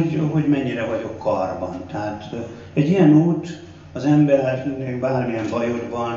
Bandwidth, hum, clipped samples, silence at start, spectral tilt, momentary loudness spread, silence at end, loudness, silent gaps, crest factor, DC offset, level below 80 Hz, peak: 7.2 kHz; 50 Hz at -40 dBFS; under 0.1%; 0 s; -8.5 dB/octave; 14 LU; 0 s; -20 LUFS; none; 16 dB; under 0.1%; -54 dBFS; -4 dBFS